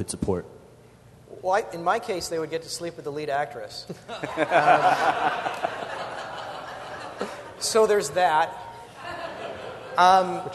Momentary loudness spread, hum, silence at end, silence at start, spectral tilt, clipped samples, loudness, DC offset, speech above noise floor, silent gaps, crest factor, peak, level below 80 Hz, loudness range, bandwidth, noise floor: 18 LU; none; 0 s; 0 s; -3.5 dB/octave; under 0.1%; -25 LUFS; under 0.1%; 27 dB; none; 22 dB; -4 dBFS; -56 dBFS; 5 LU; 12.5 kHz; -51 dBFS